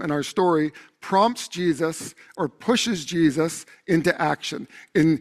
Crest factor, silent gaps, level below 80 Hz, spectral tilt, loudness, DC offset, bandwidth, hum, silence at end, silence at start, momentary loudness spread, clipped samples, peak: 18 dB; none; -60 dBFS; -5 dB/octave; -23 LUFS; under 0.1%; 14 kHz; none; 0 s; 0 s; 11 LU; under 0.1%; -6 dBFS